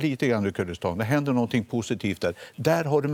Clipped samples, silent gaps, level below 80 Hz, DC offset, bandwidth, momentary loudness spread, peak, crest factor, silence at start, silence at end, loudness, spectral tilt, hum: under 0.1%; none; -58 dBFS; under 0.1%; 17.5 kHz; 6 LU; -8 dBFS; 18 dB; 0 s; 0 s; -26 LUFS; -6.5 dB/octave; none